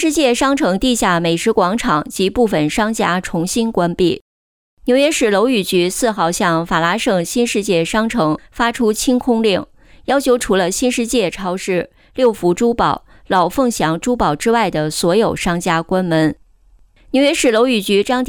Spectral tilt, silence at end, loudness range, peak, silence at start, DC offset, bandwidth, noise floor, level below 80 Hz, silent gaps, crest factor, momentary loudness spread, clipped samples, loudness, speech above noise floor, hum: -4.5 dB/octave; 0 s; 1 LU; -2 dBFS; 0 s; under 0.1%; 19.5 kHz; -49 dBFS; -40 dBFS; 4.21-4.77 s; 14 dB; 5 LU; under 0.1%; -16 LUFS; 34 dB; none